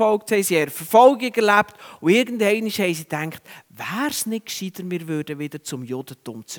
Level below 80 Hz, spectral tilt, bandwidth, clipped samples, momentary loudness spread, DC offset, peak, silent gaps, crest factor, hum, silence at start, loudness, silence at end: -68 dBFS; -4 dB/octave; over 20 kHz; under 0.1%; 16 LU; under 0.1%; 0 dBFS; none; 20 dB; none; 0 s; -21 LUFS; 0 s